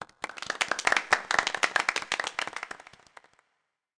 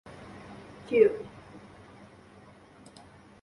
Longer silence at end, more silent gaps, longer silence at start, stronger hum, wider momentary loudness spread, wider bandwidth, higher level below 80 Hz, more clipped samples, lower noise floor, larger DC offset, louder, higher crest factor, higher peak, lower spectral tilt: second, 1.25 s vs 1.85 s; neither; second, 0 s vs 0.2 s; neither; second, 14 LU vs 28 LU; about the same, 10.5 kHz vs 11 kHz; about the same, -66 dBFS vs -64 dBFS; neither; first, -79 dBFS vs -54 dBFS; neither; about the same, -27 LUFS vs -26 LUFS; about the same, 22 dB vs 24 dB; about the same, -10 dBFS vs -8 dBFS; second, 0 dB/octave vs -6.5 dB/octave